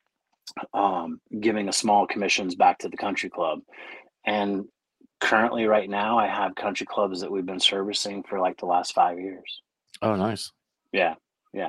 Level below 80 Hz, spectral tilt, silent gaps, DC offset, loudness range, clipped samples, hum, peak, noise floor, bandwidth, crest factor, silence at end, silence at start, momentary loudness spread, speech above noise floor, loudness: -70 dBFS; -3.5 dB/octave; none; under 0.1%; 3 LU; under 0.1%; none; -4 dBFS; -49 dBFS; 12.5 kHz; 22 dB; 0 s; 0.45 s; 17 LU; 24 dB; -25 LUFS